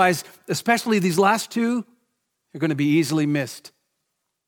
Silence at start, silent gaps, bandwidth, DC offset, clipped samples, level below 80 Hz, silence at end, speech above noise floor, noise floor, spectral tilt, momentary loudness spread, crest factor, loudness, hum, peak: 0 s; none; 19 kHz; under 0.1%; under 0.1%; -72 dBFS; 0.9 s; 56 dB; -77 dBFS; -5 dB/octave; 10 LU; 20 dB; -22 LUFS; none; -4 dBFS